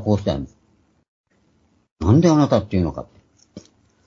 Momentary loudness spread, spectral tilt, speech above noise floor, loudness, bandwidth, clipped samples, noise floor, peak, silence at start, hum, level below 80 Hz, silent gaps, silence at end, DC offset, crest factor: 16 LU; -8 dB/octave; 44 dB; -19 LUFS; 7.6 kHz; under 0.1%; -62 dBFS; -2 dBFS; 0 s; none; -42 dBFS; 1.08-1.24 s, 1.91-1.96 s; 0.45 s; under 0.1%; 20 dB